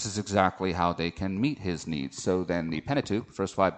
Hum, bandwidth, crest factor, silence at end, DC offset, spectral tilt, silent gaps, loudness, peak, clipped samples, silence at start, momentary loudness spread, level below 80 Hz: none; 9.2 kHz; 20 dB; 0 s; under 0.1%; -5.5 dB/octave; none; -29 LUFS; -8 dBFS; under 0.1%; 0 s; 7 LU; -54 dBFS